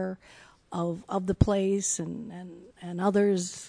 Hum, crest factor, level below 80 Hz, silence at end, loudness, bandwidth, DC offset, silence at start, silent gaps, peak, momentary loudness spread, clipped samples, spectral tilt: none; 22 dB; -46 dBFS; 0 s; -28 LUFS; 10 kHz; under 0.1%; 0 s; none; -6 dBFS; 19 LU; under 0.1%; -5.5 dB/octave